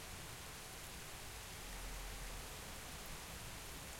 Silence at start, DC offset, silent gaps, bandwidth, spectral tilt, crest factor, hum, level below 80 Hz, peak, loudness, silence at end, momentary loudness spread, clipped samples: 0 s; under 0.1%; none; 16.5 kHz; -2.5 dB/octave; 14 dB; none; -56 dBFS; -36 dBFS; -49 LUFS; 0 s; 1 LU; under 0.1%